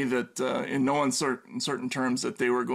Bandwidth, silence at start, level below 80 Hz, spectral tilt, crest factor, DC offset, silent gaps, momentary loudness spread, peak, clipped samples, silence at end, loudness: 15 kHz; 0 s; -72 dBFS; -4 dB/octave; 14 dB; under 0.1%; none; 5 LU; -14 dBFS; under 0.1%; 0 s; -28 LUFS